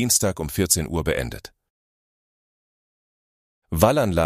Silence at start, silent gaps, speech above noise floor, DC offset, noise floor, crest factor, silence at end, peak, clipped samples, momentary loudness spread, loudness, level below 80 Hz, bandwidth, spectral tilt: 0 s; 1.70-3.62 s; over 69 dB; under 0.1%; under -90 dBFS; 22 dB; 0 s; -2 dBFS; under 0.1%; 13 LU; -21 LUFS; -40 dBFS; 15.5 kHz; -4 dB/octave